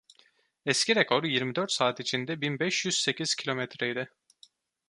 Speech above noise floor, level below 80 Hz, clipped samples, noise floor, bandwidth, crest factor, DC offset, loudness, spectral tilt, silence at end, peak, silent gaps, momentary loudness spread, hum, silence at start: 36 dB; -76 dBFS; under 0.1%; -65 dBFS; 11.5 kHz; 24 dB; under 0.1%; -28 LUFS; -3 dB/octave; 0.8 s; -6 dBFS; none; 8 LU; none; 0.65 s